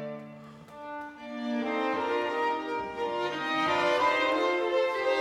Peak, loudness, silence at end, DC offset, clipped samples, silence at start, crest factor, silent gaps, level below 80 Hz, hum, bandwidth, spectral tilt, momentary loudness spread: -14 dBFS; -28 LUFS; 0 s; under 0.1%; under 0.1%; 0 s; 16 dB; none; -68 dBFS; none; 13 kHz; -4 dB/octave; 17 LU